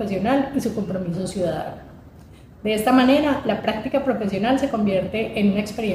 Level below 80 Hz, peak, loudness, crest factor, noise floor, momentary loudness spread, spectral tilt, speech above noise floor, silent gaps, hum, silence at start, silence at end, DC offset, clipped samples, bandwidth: -48 dBFS; -4 dBFS; -21 LUFS; 18 dB; -45 dBFS; 9 LU; -6 dB/octave; 24 dB; none; none; 0 s; 0 s; under 0.1%; under 0.1%; 16 kHz